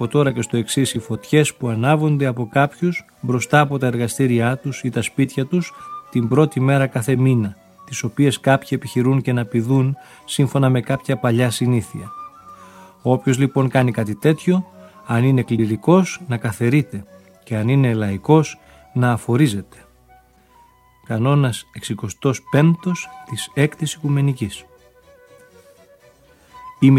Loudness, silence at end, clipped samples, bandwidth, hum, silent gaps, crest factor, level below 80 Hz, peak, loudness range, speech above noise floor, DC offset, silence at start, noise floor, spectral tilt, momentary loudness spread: -19 LUFS; 0 s; under 0.1%; 15 kHz; none; none; 18 dB; -56 dBFS; 0 dBFS; 3 LU; 34 dB; under 0.1%; 0 s; -52 dBFS; -6.5 dB/octave; 11 LU